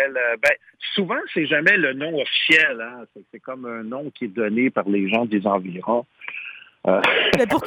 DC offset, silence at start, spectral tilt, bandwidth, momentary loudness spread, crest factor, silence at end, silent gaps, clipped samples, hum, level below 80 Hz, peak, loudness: under 0.1%; 0 s; -5 dB/octave; 16 kHz; 17 LU; 18 dB; 0 s; none; under 0.1%; none; -58 dBFS; -4 dBFS; -20 LUFS